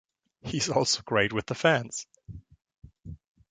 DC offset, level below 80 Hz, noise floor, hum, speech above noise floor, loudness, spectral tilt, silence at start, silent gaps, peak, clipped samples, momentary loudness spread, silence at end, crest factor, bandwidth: under 0.1%; -56 dBFS; -47 dBFS; none; 20 dB; -27 LUFS; -3.5 dB/octave; 0.45 s; none; -8 dBFS; under 0.1%; 23 LU; 0.35 s; 22 dB; 9.6 kHz